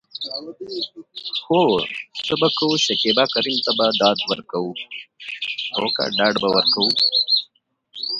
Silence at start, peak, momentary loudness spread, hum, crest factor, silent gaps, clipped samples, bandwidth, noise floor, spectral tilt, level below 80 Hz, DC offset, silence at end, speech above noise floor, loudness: 0.15 s; -2 dBFS; 15 LU; none; 20 dB; none; under 0.1%; 11 kHz; -61 dBFS; -3.5 dB/octave; -64 dBFS; under 0.1%; 0 s; 40 dB; -19 LUFS